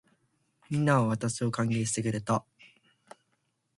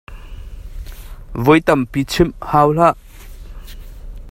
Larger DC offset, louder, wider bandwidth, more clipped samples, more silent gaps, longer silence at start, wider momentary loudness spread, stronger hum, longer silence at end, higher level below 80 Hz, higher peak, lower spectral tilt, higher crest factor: neither; second, -29 LUFS vs -15 LUFS; second, 11.5 kHz vs 16.5 kHz; neither; neither; first, 0.7 s vs 0.1 s; second, 6 LU vs 25 LU; neither; first, 1.35 s vs 0 s; second, -64 dBFS vs -32 dBFS; second, -12 dBFS vs 0 dBFS; about the same, -5.5 dB/octave vs -6.5 dB/octave; about the same, 20 dB vs 18 dB